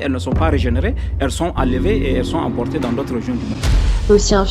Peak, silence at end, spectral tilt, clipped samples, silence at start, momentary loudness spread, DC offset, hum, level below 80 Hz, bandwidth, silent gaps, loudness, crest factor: 0 dBFS; 0 s; -6 dB/octave; under 0.1%; 0 s; 7 LU; under 0.1%; none; -22 dBFS; 12.5 kHz; none; -18 LUFS; 16 dB